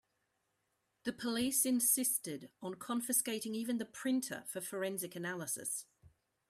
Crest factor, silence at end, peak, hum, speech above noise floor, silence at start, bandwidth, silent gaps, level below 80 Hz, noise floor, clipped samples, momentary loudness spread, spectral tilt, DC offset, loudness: 20 dB; 0.4 s; -18 dBFS; none; 45 dB; 1.05 s; 16 kHz; none; -78 dBFS; -82 dBFS; under 0.1%; 14 LU; -2.5 dB/octave; under 0.1%; -36 LUFS